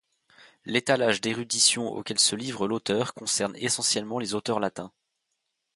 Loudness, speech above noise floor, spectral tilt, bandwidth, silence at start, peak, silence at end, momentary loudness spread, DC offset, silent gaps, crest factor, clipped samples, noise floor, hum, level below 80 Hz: -25 LUFS; 53 dB; -2 dB/octave; 12 kHz; 0.45 s; -6 dBFS; 0.85 s; 9 LU; under 0.1%; none; 22 dB; under 0.1%; -80 dBFS; none; -68 dBFS